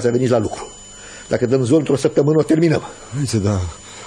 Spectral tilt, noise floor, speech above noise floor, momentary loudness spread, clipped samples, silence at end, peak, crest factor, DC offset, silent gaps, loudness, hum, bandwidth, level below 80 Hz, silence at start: -6.5 dB/octave; -37 dBFS; 20 dB; 17 LU; under 0.1%; 0 s; -4 dBFS; 14 dB; under 0.1%; none; -17 LUFS; none; 13 kHz; -44 dBFS; 0 s